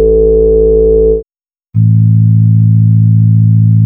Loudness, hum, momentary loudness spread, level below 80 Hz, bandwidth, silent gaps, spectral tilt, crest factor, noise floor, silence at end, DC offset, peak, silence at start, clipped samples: -8 LUFS; none; 4 LU; -20 dBFS; 1 kHz; none; -15.5 dB/octave; 6 dB; under -90 dBFS; 0 s; under 0.1%; 0 dBFS; 0 s; under 0.1%